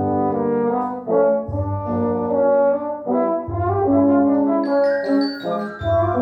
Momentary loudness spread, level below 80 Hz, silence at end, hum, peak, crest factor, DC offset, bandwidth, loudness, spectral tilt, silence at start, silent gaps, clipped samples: 7 LU; -48 dBFS; 0 s; none; -6 dBFS; 12 dB; under 0.1%; 5.4 kHz; -19 LUFS; -9.5 dB/octave; 0 s; none; under 0.1%